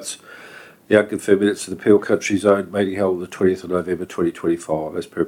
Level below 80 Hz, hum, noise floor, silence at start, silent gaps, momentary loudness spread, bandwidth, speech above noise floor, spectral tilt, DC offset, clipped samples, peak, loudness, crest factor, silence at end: -58 dBFS; none; -42 dBFS; 0 s; none; 9 LU; 16 kHz; 23 dB; -5.5 dB/octave; under 0.1%; under 0.1%; 0 dBFS; -20 LUFS; 20 dB; 0 s